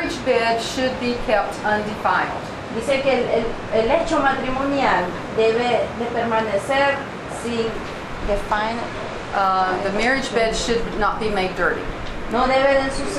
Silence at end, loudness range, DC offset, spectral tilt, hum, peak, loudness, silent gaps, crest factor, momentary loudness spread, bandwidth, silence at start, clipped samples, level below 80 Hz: 0 s; 3 LU; under 0.1%; -4.5 dB/octave; none; -6 dBFS; -21 LUFS; none; 16 dB; 8 LU; 13 kHz; 0 s; under 0.1%; -36 dBFS